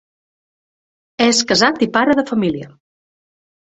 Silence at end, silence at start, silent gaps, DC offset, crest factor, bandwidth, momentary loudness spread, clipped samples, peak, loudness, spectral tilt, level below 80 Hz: 0.95 s; 1.2 s; none; under 0.1%; 18 dB; 8.2 kHz; 8 LU; under 0.1%; 0 dBFS; -15 LUFS; -3 dB/octave; -56 dBFS